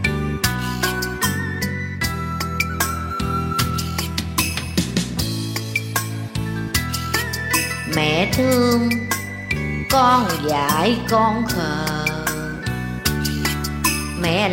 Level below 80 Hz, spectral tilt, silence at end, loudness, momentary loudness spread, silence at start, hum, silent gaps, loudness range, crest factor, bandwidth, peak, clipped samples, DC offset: -36 dBFS; -4 dB/octave; 0 s; -21 LUFS; 7 LU; 0 s; none; none; 4 LU; 18 dB; 16.5 kHz; -2 dBFS; under 0.1%; under 0.1%